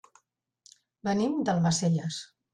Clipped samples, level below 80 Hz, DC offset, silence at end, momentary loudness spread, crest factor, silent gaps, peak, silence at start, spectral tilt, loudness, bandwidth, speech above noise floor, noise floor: under 0.1%; -64 dBFS; under 0.1%; 0.3 s; 11 LU; 14 dB; none; -16 dBFS; 1.05 s; -5.5 dB/octave; -28 LUFS; 10.5 kHz; 45 dB; -72 dBFS